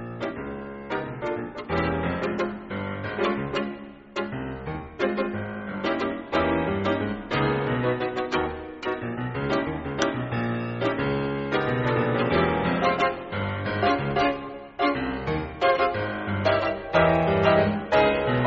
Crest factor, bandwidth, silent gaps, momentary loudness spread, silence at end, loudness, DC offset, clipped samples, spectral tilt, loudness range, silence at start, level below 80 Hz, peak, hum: 18 dB; 7.6 kHz; none; 11 LU; 0 s; -26 LUFS; under 0.1%; under 0.1%; -4.5 dB/octave; 6 LU; 0 s; -46 dBFS; -8 dBFS; none